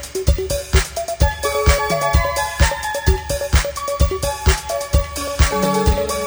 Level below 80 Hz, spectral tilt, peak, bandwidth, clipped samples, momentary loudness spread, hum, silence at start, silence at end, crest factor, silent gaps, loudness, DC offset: -22 dBFS; -4.5 dB/octave; 0 dBFS; over 20 kHz; under 0.1%; 4 LU; none; 0 s; 0 s; 16 dB; none; -19 LUFS; under 0.1%